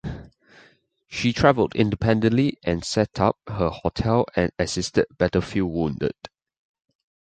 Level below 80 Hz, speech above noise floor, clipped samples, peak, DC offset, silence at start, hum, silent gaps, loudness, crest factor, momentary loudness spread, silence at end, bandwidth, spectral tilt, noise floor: -42 dBFS; 36 dB; under 0.1%; -2 dBFS; under 0.1%; 0.05 s; none; none; -23 LUFS; 22 dB; 9 LU; 1.1 s; 9.4 kHz; -6 dB/octave; -58 dBFS